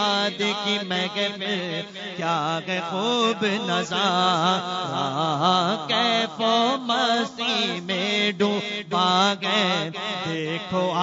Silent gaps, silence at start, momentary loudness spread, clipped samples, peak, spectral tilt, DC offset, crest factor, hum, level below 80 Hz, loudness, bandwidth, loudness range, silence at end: none; 0 s; 7 LU; under 0.1%; -6 dBFS; -4 dB/octave; under 0.1%; 18 dB; none; -68 dBFS; -23 LUFS; 7.8 kHz; 3 LU; 0 s